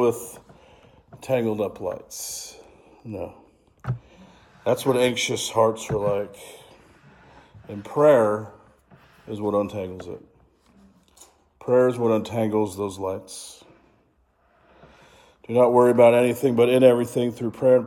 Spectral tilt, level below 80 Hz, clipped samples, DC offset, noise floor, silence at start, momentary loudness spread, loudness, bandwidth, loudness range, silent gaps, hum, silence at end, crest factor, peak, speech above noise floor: -5.5 dB/octave; -60 dBFS; under 0.1%; under 0.1%; -64 dBFS; 0 s; 21 LU; -22 LUFS; 17.5 kHz; 11 LU; none; none; 0 s; 22 dB; -2 dBFS; 42 dB